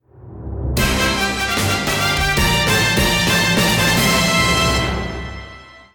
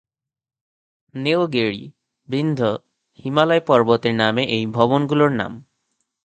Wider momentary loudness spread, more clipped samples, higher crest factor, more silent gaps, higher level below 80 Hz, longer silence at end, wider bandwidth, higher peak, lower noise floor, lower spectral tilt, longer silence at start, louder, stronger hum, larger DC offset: about the same, 14 LU vs 13 LU; neither; second, 12 dB vs 20 dB; neither; first, -28 dBFS vs -60 dBFS; second, 0.15 s vs 0.65 s; first, over 20 kHz vs 8.8 kHz; second, -6 dBFS vs 0 dBFS; second, -39 dBFS vs -73 dBFS; second, -3.5 dB/octave vs -7 dB/octave; second, 0.2 s vs 1.15 s; first, -15 LUFS vs -19 LUFS; neither; neither